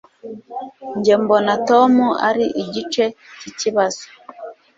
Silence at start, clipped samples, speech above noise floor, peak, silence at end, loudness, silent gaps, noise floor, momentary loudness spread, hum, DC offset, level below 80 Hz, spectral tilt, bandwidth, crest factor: 0.25 s; under 0.1%; 19 dB; -2 dBFS; 0.25 s; -17 LUFS; none; -36 dBFS; 22 LU; none; under 0.1%; -62 dBFS; -4.5 dB/octave; 7.8 kHz; 16 dB